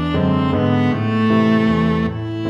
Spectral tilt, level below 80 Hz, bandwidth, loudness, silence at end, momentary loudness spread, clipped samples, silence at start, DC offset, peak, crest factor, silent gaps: -8.5 dB/octave; -38 dBFS; 7 kHz; -17 LUFS; 0 s; 4 LU; under 0.1%; 0 s; under 0.1%; -4 dBFS; 12 dB; none